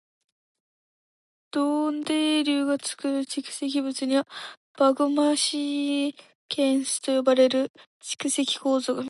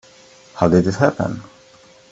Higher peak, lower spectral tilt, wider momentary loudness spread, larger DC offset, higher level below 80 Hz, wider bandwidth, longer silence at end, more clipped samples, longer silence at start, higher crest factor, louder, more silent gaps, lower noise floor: second, -8 dBFS vs 0 dBFS; second, -2 dB/octave vs -7.5 dB/octave; second, 10 LU vs 17 LU; neither; second, -80 dBFS vs -50 dBFS; first, 11.5 kHz vs 8 kHz; second, 0 s vs 0.7 s; neither; first, 1.55 s vs 0.55 s; about the same, 16 dB vs 20 dB; second, -25 LUFS vs -18 LUFS; first, 4.57-4.75 s, 6.35-6.49 s, 7.70-7.74 s, 7.86-8.00 s vs none; first, under -90 dBFS vs -48 dBFS